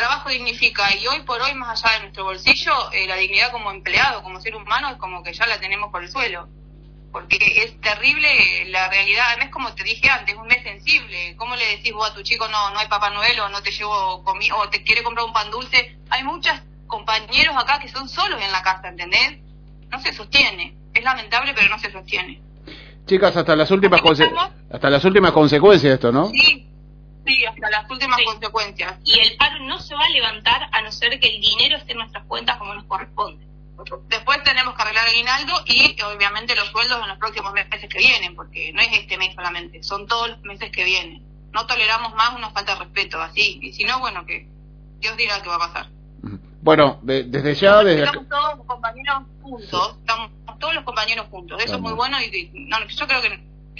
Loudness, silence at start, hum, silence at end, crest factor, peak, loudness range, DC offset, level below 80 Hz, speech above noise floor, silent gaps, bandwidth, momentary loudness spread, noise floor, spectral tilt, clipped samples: -17 LUFS; 0 s; none; 0 s; 20 dB; 0 dBFS; 7 LU; under 0.1%; -44 dBFS; 23 dB; none; 5.4 kHz; 14 LU; -42 dBFS; -4 dB/octave; under 0.1%